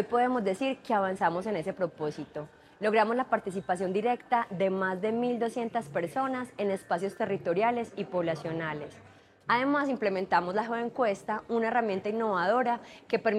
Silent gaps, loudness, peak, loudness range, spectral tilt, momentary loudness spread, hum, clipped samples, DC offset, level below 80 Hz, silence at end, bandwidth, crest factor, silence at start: none; -30 LUFS; -12 dBFS; 2 LU; -6 dB/octave; 7 LU; none; under 0.1%; under 0.1%; -70 dBFS; 0 s; 12.5 kHz; 18 dB; 0 s